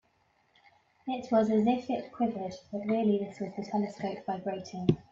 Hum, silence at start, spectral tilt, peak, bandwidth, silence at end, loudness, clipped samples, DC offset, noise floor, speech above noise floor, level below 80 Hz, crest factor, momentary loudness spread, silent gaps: none; 1.05 s; -7.5 dB/octave; -8 dBFS; 7.6 kHz; 0.1 s; -31 LUFS; under 0.1%; under 0.1%; -70 dBFS; 40 dB; -64 dBFS; 22 dB; 11 LU; none